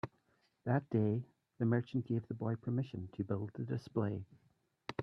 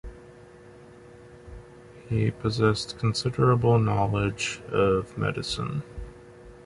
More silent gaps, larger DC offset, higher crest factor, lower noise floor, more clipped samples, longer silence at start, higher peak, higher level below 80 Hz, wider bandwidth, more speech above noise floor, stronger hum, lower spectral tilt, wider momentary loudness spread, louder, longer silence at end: neither; neither; about the same, 20 dB vs 18 dB; first, -76 dBFS vs -49 dBFS; neither; about the same, 0.05 s vs 0.05 s; second, -18 dBFS vs -8 dBFS; second, -74 dBFS vs -46 dBFS; second, 6.4 kHz vs 11.5 kHz; first, 40 dB vs 24 dB; neither; first, -9.5 dB/octave vs -6 dB/octave; second, 12 LU vs 23 LU; second, -38 LUFS vs -26 LUFS; about the same, 0 s vs 0.05 s